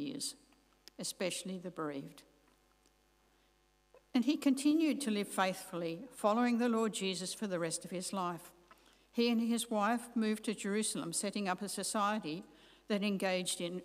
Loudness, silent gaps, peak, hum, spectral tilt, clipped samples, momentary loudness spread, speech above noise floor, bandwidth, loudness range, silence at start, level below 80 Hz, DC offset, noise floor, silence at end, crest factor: -36 LUFS; none; -18 dBFS; 50 Hz at -75 dBFS; -4 dB/octave; under 0.1%; 10 LU; 37 dB; 15.5 kHz; 9 LU; 0 s; -76 dBFS; under 0.1%; -72 dBFS; 0 s; 20 dB